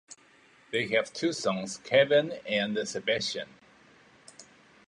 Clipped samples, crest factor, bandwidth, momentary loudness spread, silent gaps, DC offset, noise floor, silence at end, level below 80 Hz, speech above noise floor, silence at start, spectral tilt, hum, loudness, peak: under 0.1%; 22 dB; 11 kHz; 10 LU; none; under 0.1%; -60 dBFS; 0.45 s; -72 dBFS; 32 dB; 0.1 s; -3.5 dB/octave; none; -28 LUFS; -10 dBFS